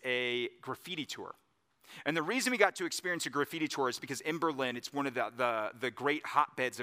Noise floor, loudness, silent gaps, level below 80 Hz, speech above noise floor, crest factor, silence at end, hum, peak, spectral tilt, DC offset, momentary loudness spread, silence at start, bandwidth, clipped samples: -61 dBFS; -34 LUFS; none; -86 dBFS; 27 dB; 26 dB; 0 s; none; -8 dBFS; -3 dB/octave; under 0.1%; 10 LU; 0.05 s; 15.5 kHz; under 0.1%